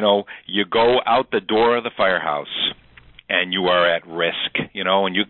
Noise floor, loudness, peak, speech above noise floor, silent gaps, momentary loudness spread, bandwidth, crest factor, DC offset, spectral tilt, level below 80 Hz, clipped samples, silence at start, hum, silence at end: -48 dBFS; -19 LUFS; -4 dBFS; 28 dB; none; 6 LU; 4.3 kHz; 16 dB; under 0.1%; -9 dB/octave; -56 dBFS; under 0.1%; 0 s; none; 0.05 s